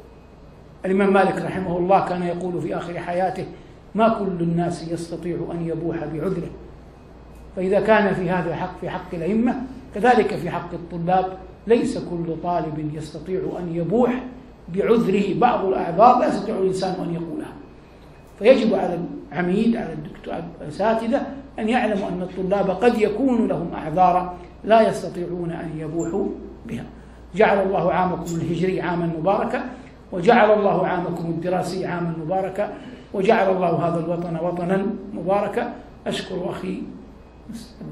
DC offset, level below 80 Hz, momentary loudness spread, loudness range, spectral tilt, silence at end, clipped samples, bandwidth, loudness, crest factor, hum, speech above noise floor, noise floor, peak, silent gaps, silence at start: under 0.1%; -48 dBFS; 15 LU; 4 LU; -7 dB/octave; 0 s; under 0.1%; 12.5 kHz; -22 LUFS; 22 dB; none; 24 dB; -45 dBFS; 0 dBFS; none; 0.05 s